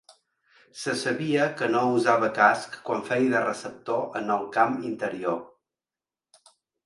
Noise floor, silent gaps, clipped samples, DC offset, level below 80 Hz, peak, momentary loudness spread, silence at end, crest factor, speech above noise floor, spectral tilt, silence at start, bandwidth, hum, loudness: under -90 dBFS; none; under 0.1%; under 0.1%; -72 dBFS; -4 dBFS; 10 LU; 1.4 s; 22 dB; over 65 dB; -5 dB/octave; 0.75 s; 11.5 kHz; none; -25 LUFS